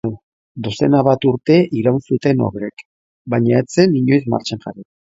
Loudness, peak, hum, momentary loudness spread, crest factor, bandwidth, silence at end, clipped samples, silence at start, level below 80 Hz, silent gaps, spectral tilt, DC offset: -16 LUFS; 0 dBFS; none; 14 LU; 16 dB; 8 kHz; 0.2 s; under 0.1%; 0.05 s; -52 dBFS; 0.23-0.55 s, 2.85-3.25 s; -7 dB/octave; under 0.1%